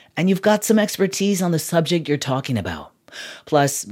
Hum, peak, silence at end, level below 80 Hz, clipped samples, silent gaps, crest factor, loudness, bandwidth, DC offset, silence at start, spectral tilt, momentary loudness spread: none; -2 dBFS; 0 s; -54 dBFS; under 0.1%; none; 18 dB; -20 LUFS; 16.5 kHz; under 0.1%; 0.15 s; -5 dB/octave; 17 LU